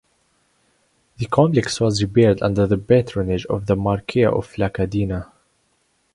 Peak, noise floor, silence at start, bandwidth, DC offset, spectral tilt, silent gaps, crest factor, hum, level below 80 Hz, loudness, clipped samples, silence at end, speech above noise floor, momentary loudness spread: 0 dBFS; -65 dBFS; 1.2 s; 11.5 kHz; under 0.1%; -6.5 dB/octave; none; 20 dB; none; -42 dBFS; -19 LUFS; under 0.1%; 0.9 s; 47 dB; 7 LU